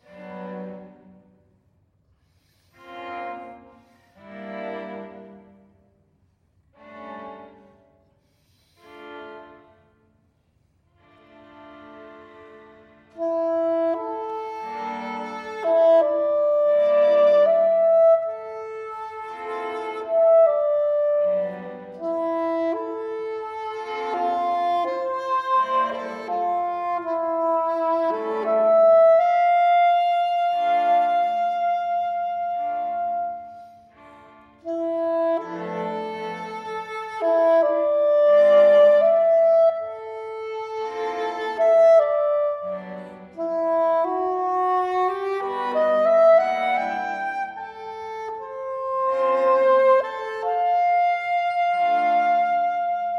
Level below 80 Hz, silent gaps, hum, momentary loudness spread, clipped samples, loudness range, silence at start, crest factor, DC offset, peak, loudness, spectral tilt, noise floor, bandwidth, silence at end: -70 dBFS; none; none; 17 LU; under 0.1%; 19 LU; 0.15 s; 14 dB; under 0.1%; -8 dBFS; -21 LUFS; -5.5 dB/octave; -64 dBFS; 6.4 kHz; 0 s